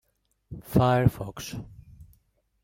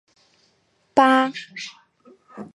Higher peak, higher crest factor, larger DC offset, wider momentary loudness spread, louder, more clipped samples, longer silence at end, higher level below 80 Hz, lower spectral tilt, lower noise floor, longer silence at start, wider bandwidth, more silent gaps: second, -6 dBFS vs -2 dBFS; about the same, 22 dB vs 22 dB; neither; first, 23 LU vs 20 LU; second, -25 LUFS vs -19 LUFS; neither; first, 0.6 s vs 0.1 s; first, -48 dBFS vs -72 dBFS; first, -7 dB/octave vs -3.5 dB/octave; about the same, -67 dBFS vs -65 dBFS; second, 0.5 s vs 0.95 s; first, 16.5 kHz vs 11 kHz; neither